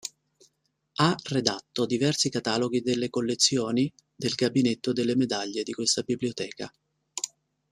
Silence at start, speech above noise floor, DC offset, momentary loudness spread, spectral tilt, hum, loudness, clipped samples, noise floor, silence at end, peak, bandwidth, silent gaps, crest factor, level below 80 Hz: 0.05 s; 47 dB; under 0.1%; 12 LU; -4 dB/octave; none; -27 LUFS; under 0.1%; -73 dBFS; 0.45 s; -4 dBFS; 13.5 kHz; none; 24 dB; -66 dBFS